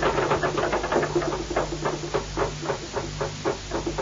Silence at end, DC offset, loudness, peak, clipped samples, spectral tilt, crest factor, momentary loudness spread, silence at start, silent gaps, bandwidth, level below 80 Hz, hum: 0 s; under 0.1%; -27 LUFS; -10 dBFS; under 0.1%; -4.5 dB/octave; 16 dB; 6 LU; 0 s; none; 7.6 kHz; -40 dBFS; none